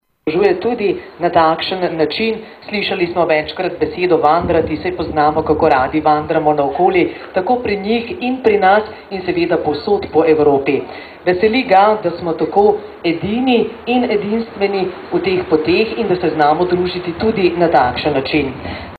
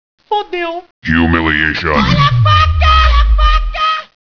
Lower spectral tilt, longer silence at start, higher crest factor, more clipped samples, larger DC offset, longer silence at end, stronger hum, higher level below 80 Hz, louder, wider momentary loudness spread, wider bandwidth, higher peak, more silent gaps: first, -8 dB/octave vs -6.5 dB/octave; about the same, 0.25 s vs 0.3 s; about the same, 14 dB vs 12 dB; neither; neither; second, 0 s vs 0.35 s; neither; second, -42 dBFS vs -16 dBFS; second, -15 LUFS vs -12 LUFS; about the same, 8 LU vs 10 LU; second, 4.9 kHz vs 5.4 kHz; about the same, 0 dBFS vs 0 dBFS; second, none vs 0.91-1.02 s